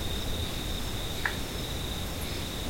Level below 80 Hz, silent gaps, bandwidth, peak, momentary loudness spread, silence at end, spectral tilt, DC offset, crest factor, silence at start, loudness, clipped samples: -38 dBFS; none; 16.5 kHz; -12 dBFS; 2 LU; 0 s; -3.5 dB/octave; 0.1%; 22 dB; 0 s; -33 LUFS; under 0.1%